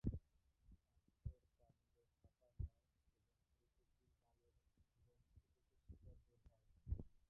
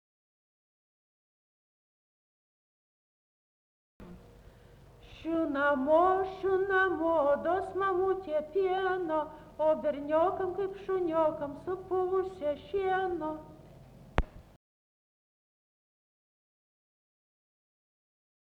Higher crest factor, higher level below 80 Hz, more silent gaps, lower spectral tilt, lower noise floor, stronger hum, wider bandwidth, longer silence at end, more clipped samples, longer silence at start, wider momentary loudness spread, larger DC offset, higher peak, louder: about the same, 28 dB vs 24 dB; second, -62 dBFS vs -52 dBFS; neither; first, -13.5 dB/octave vs -7.5 dB/octave; first, -85 dBFS vs -56 dBFS; neither; second, 2 kHz vs 6.8 kHz; second, 0.2 s vs 4.15 s; neither; second, 0.05 s vs 4 s; first, 14 LU vs 9 LU; neither; second, -28 dBFS vs -10 dBFS; second, -56 LUFS vs -30 LUFS